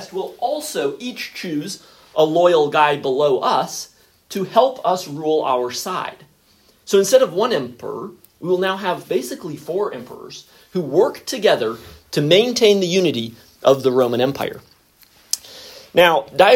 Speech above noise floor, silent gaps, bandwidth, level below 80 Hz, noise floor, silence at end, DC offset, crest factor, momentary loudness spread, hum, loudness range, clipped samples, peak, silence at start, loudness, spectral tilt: 37 dB; none; 16.5 kHz; -62 dBFS; -55 dBFS; 0 s; under 0.1%; 18 dB; 17 LU; none; 5 LU; under 0.1%; 0 dBFS; 0 s; -18 LUFS; -4 dB/octave